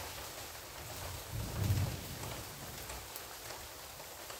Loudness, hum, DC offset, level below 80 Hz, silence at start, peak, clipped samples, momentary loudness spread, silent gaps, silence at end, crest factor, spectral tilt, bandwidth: -42 LUFS; none; under 0.1%; -54 dBFS; 0 s; -22 dBFS; under 0.1%; 10 LU; none; 0 s; 20 dB; -4 dB/octave; 16 kHz